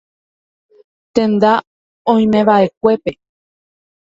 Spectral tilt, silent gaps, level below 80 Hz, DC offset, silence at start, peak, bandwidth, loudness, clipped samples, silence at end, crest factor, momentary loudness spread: -7.5 dB/octave; 1.67-2.05 s, 2.77-2.81 s; -54 dBFS; under 0.1%; 1.15 s; 0 dBFS; 7.6 kHz; -14 LUFS; under 0.1%; 1 s; 16 dB; 9 LU